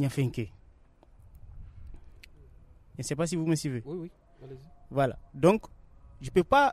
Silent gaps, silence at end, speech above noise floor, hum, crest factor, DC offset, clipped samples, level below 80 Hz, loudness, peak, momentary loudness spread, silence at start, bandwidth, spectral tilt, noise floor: none; 0 s; 29 dB; none; 22 dB; under 0.1%; under 0.1%; -52 dBFS; -29 LUFS; -8 dBFS; 25 LU; 0 s; 14.5 kHz; -6 dB/octave; -58 dBFS